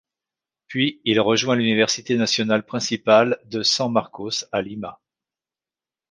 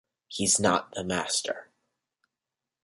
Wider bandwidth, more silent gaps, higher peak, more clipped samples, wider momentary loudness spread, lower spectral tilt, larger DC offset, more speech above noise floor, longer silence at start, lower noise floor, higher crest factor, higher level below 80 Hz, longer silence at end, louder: second, 10 kHz vs 11.5 kHz; neither; first, -2 dBFS vs -10 dBFS; neither; second, 10 LU vs 14 LU; about the same, -3.5 dB/octave vs -2.5 dB/octave; neither; first, over 69 dB vs 61 dB; first, 0.7 s vs 0.3 s; about the same, under -90 dBFS vs -89 dBFS; about the same, 20 dB vs 22 dB; about the same, -64 dBFS vs -60 dBFS; about the same, 1.15 s vs 1.2 s; first, -20 LUFS vs -26 LUFS